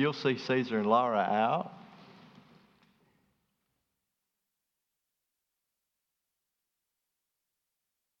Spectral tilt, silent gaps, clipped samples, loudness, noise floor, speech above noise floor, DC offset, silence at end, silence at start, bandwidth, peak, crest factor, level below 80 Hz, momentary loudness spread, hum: -6.5 dB/octave; none; under 0.1%; -29 LUFS; -86 dBFS; 57 dB; under 0.1%; 6.15 s; 0 s; 7.2 kHz; -12 dBFS; 24 dB; -88 dBFS; 6 LU; none